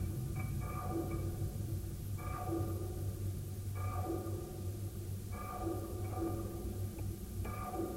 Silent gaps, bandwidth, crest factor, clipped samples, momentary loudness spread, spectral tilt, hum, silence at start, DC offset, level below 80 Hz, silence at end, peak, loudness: none; 16 kHz; 12 dB; under 0.1%; 4 LU; -7 dB/octave; none; 0 s; under 0.1%; -48 dBFS; 0 s; -26 dBFS; -41 LUFS